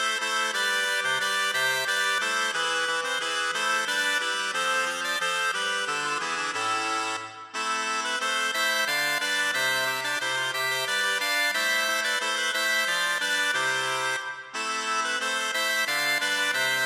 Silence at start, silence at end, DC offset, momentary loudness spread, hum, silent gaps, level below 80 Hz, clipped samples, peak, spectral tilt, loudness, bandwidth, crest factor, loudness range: 0 s; 0 s; under 0.1%; 4 LU; none; none; -86 dBFS; under 0.1%; -14 dBFS; 0.5 dB/octave; -25 LUFS; 17 kHz; 14 dB; 2 LU